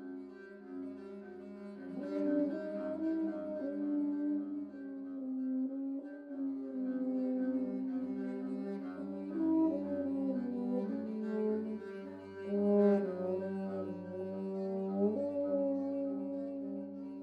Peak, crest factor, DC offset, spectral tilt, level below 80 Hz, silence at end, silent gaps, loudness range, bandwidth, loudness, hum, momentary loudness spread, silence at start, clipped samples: -18 dBFS; 18 dB; under 0.1%; -10 dB/octave; -84 dBFS; 0 s; none; 4 LU; 5.2 kHz; -37 LUFS; none; 12 LU; 0 s; under 0.1%